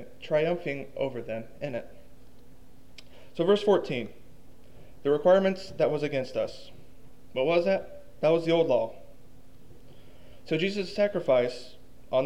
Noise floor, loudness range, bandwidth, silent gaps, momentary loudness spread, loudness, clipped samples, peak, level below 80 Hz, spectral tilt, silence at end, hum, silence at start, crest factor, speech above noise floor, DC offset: -55 dBFS; 4 LU; 14 kHz; none; 13 LU; -28 LUFS; under 0.1%; -10 dBFS; -58 dBFS; -6.5 dB/octave; 0 s; none; 0 s; 18 dB; 28 dB; 0.7%